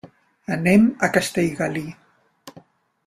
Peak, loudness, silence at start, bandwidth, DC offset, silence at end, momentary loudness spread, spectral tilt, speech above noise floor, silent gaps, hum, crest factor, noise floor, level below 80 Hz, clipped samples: -2 dBFS; -20 LUFS; 0.05 s; 15.5 kHz; under 0.1%; 0.45 s; 16 LU; -5.5 dB/octave; 31 dB; none; none; 20 dB; -51 dBFS; -56 dBFS; under 0.1%